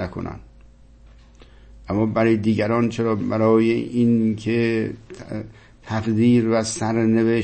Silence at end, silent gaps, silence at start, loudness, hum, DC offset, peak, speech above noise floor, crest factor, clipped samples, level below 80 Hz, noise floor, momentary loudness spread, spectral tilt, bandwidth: 0 s; none; 0 s; -20 LUFS; none; under 0.1%; -6 dBFS; 28 dB; 16 dB; under 0.1%; -48 dBFS; -47 dBFS; 16 LU; -6.5 dB/octave; 8.8 kHz